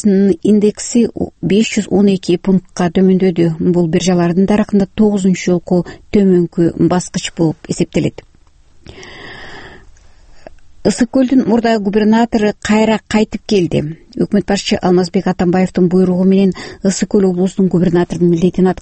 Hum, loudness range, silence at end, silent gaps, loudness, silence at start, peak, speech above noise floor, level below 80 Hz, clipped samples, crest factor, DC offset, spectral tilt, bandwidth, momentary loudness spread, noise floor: none; 6 LU; 0.1 s; none; -13 LUFS; 0.05 s; 0 dBFS; 32 dB; -40 dBFS; under 0.1%; 14 dB; under 0.1%; -6.5 dB/octave; 8.8 kHz; 6 LU; -45 dBFS